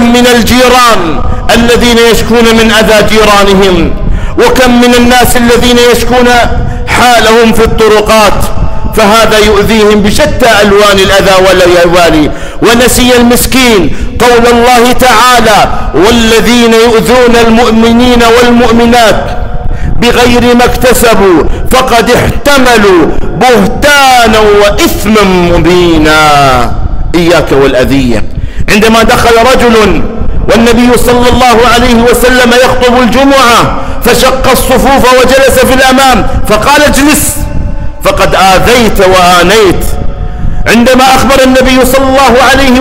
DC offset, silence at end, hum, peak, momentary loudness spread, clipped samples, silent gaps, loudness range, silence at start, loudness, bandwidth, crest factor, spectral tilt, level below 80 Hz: under 0.1%; 0 s; none; 0 dBFS; 8 LU; 0.9%; none; 2 LU; 0 s; -4 LUFS; 16.5 kHz; 4 dB; -4 dB/octave; -14 dBFS